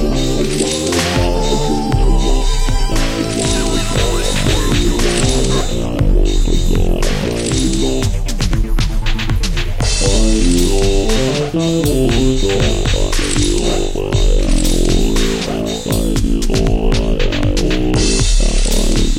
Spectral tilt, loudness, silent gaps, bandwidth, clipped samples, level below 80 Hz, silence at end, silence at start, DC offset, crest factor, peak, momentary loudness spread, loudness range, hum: -4.5 dB/octave; -16 LUFS; none; 15.5 kHz; under 0.1%; -16 dBFS; 0 s; 0 s; under 0.1%; 12 dB; -2 dBFS; 4 LU; 2 LU; none